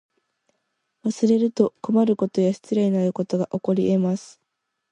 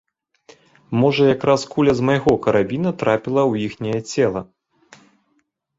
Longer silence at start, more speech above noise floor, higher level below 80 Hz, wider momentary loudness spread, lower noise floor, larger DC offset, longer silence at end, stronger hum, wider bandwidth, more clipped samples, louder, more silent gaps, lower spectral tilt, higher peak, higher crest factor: first, 1.05 s vs 0.9 s; first, 57 dB vs 50 dB; second, -66 dBFS vs -52 dBFS; about the same, 6 LU vs 8 LU; first, -78 dBFS vs -67 dBFS; neither; second, 0.65 s vs 1.35 s; neither; first, 9.8 kHz vs 7.8 kHz; neither; second, -22 LUFS vs -19 LUFS; neither; first, -8 dB/octave vs -6.5 dB/octave; about the same, -4 dBFS vs -2 dBFS; about the same, 18 dB vs 18 dB